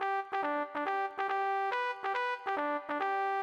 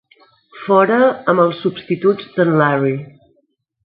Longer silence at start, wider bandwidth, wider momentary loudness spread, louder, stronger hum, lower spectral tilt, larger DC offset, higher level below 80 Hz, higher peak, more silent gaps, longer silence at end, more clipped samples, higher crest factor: second, 0 s vs 0.55 s; first, 9 kHz vs 5 kHz; second, 2 LU vs 8 LU; second, -34 LUFS vs -15 LUFS; neither; second, -3 dB/octave vs -11.5 dB/octave; neither; second, -86 dBFS vs -64 dBFS; second, -20 dBFS vs 0 dBFS; neither; second, 0 s vs 0.75 s; neither; about the same, 14 dB vs 16 dB